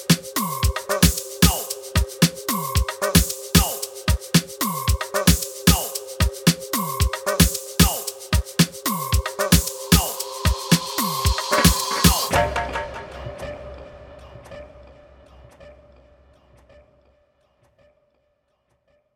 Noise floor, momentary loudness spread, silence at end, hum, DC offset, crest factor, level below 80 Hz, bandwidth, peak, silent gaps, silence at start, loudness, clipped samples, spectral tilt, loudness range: -69 dBFS; 15 LU; 3.45 s; none; under 0.1%; 22 dB; -30 dBFS; 19.5 kHz; 0 dBFS; none; 0 s; -20 LUFS; under 0.1%; -4 dB/octave; 7 LU